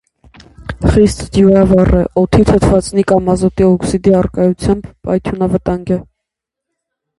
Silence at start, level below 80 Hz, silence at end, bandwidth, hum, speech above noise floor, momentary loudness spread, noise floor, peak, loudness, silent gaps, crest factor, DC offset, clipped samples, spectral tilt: 0.6 s; -26 dBFS; 1.15 s; 11.5 kHz; none; 68 dB; 9 LU; -79 dBFS; 0 dBFS; -12 LUFS; none; 12 dB; under 0.1%; under 0.1%; -7.5 dB/octave